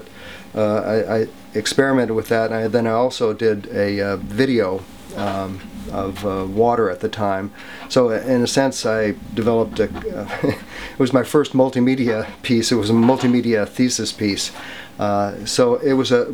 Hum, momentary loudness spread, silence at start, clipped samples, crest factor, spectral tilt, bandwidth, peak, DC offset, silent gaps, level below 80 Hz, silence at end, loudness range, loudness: none; 10 LU; 0 s; under 0.1%; 16 dB; -5 dB/octave; over 20 kHz; -2 dBFS; 0.5%; none; -48 dBFS; 0 s; 4 LU; -19 LUFS